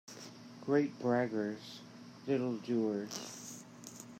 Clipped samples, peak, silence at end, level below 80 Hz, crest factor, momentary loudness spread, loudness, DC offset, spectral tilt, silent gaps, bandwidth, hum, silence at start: under 0.1%; -18 dBFS; 0 s; -84 dBFS; 18 dB; 17 LU; -36 LUFS; under 0.1%; -5.5 dB/octave; none; 16 kHz; none; 0.05 s